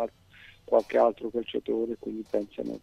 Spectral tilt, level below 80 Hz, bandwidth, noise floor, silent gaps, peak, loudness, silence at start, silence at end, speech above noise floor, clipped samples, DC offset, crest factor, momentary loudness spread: -6.5 dB/octave; -62 dBFS; 11.5 kHz; -54 dBFS; none; -10 dBFS; -29 LUFS; 0 s; 0.05 s; 26 dB; under 0.1%; under 0.1%; 20 dB; 11 LU